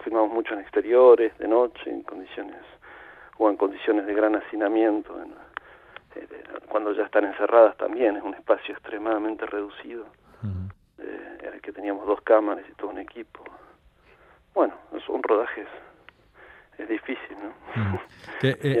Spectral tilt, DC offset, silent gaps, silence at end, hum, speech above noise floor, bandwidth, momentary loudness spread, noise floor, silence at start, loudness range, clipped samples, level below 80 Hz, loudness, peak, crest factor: -8.5 dB/octave; under 0.1%; none; 0 s; none; 33 dB; 8.4 kHz; 21 LU; -57 dBFS; 0 s; 8 LU; under 0.1%; -64 dBFS; -24 LUFS; -4 dBFS; 22 dB